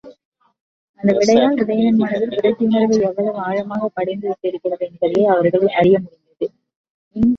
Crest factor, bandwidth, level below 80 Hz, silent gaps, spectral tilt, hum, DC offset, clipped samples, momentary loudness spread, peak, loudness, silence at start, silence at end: 16 dB; 7.6 kHz; -52 dBFS; 0.25-0.32 s, 0.61-0.94 s, 6.76-6.84 s, 6.90-7.11 s; -6.5 dB/octave; none; under 0.1%; under 0.1%; 11 LU; -2 dBFS; -17 LUFS; 0.05 s; 0 s